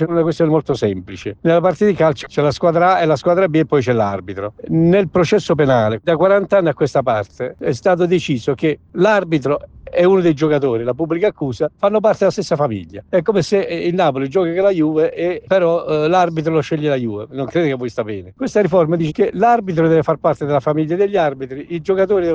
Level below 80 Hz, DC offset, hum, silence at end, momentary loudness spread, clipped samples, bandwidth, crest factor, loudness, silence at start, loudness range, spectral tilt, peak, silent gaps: -50 dBFS; under 0.1%; none; 0 s; 8 LU; under 0.1%; 8.8 kHz; 14 dB; -16 LUFS; 0 s; 2 LU; -7 dB/octave; -2 dBFS; none